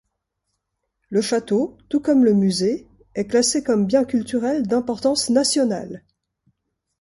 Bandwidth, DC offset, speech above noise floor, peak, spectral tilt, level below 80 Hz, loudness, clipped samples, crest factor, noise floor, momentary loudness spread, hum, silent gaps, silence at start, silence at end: 11.5 kHz; under 0.1%; 57 dB; -4 dBFS; -4.5 dB/octave; -58 dBFS; -20 LUFS; under 0.1%; 16 dB; -77 dBFS; 12 LU; none; none; 1.1 s; 1 s